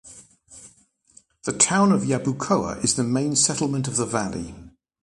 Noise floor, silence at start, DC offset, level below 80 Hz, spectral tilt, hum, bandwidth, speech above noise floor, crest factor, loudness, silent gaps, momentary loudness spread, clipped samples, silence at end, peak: -58 dBFS; 0.05 s; under 0.1%; -52 dBFS; -4 dB/octave; none; 11.5 kHz; 36 dB; 22 dB; -22 LUFS; none; 13 LU; under 0.1%; 0.35 s; -2 dBFS